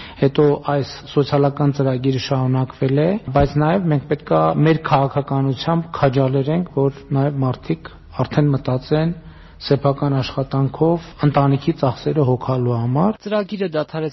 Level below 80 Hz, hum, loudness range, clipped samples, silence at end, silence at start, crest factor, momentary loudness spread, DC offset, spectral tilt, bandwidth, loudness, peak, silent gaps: -42 dBFS; none; 3 LU; under 0.1%; 0 s; 0 s; 16 dB; 6 LU; under 0.1%; -7 dB/octave; 6 kHz; -19 LUFS; -2 dBFS; none